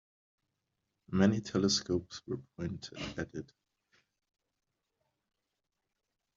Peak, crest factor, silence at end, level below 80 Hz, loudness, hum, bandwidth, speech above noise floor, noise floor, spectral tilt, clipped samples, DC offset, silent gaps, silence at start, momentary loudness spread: -12 dBFS; 26 dB; 2.9 s; -66 dBFS; -34 LUFS; none; 7.4 kHz; 53 dB; -86 dBFS; -5 dB/octave; under 0.1%; under 0.1%; none; 1.1 s; 14 LU